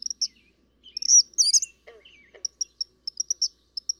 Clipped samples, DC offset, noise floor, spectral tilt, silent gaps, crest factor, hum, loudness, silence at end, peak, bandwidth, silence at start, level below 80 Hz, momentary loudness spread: under 0.1%; under 0.1%; -62 dBFS; 4.5 dB/octave; none; 18 dB; none; -22 LUFS; 0.5 s; -8 dBFS; 18 kHz; 0.2 s; -70 dBFS; 18 LU